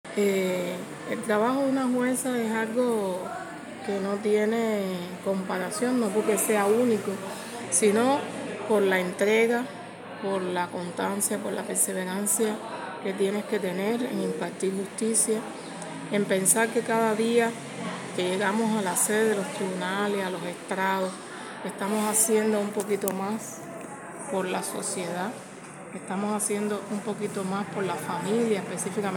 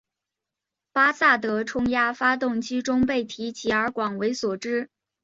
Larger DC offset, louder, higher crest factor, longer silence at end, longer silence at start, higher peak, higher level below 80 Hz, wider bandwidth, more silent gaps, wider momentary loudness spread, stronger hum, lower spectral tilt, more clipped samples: neither; second, -27 LUFS vs -24 LUFS; about the same, 22 dB vs 20 dB; second, 0 s vs 0.35 s; second, 0.05 s vs 0.95 s; about the same, -4 dBFS vs -6 dBFS; second, -78 dBFS vs -56 dBFS; first, 17 kHz vs 7.8 kHz; neither; first, 13 LU vs 10 LU; neither; about the same, -4 dB/octave vs -4 dB/octave; neither